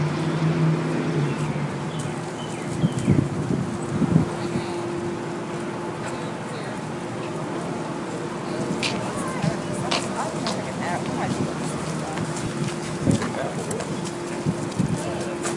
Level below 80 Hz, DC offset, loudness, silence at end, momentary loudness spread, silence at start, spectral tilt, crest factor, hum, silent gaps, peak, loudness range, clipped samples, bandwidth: -52 dBFS; under 0.1%; -26 LUFS; 0 s; 8 LU; 0 s; -5.5 dB/octave; 22 dB; none; none; -4 dBFS; 5 LU; under 0.1%; 11.5 kHz